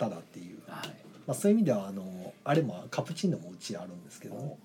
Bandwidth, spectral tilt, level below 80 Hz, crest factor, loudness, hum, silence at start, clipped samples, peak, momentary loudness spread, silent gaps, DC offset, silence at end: 18 kHz; -6 dB/octave; -78 dBFS; 18 dB; -32 LUFS; none; 0 s; under 0.1%; -14 dBFS; 18 LU; none; under 0.1%; 0.1 s